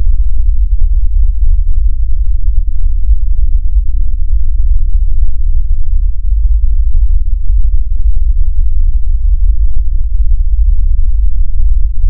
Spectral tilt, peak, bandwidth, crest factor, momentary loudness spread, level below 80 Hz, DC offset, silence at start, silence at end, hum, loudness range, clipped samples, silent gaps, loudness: -22.5 dB/octave; 0 dBFS; 0.3 kHz; 6 dB; 3 LU; -8 dBFS; under 0.1%; 0 s; 0 s; none; 1 LU; under 0.1%; none; -16 LUFS